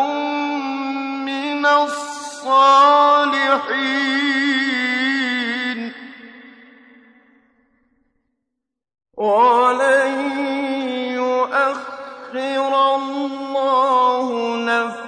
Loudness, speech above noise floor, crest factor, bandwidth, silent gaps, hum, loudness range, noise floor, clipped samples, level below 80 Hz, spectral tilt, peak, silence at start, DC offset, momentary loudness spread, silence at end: -17 LUFS; 66 dB; 16 dB; 10.5 kHz; none; none; 9 LU; -80 dBFS; under 0.1%; -76 dBFS; -2.5 dB/octave; -2 dBFS; 0 s; under 0.1%; 12 LU; 0 s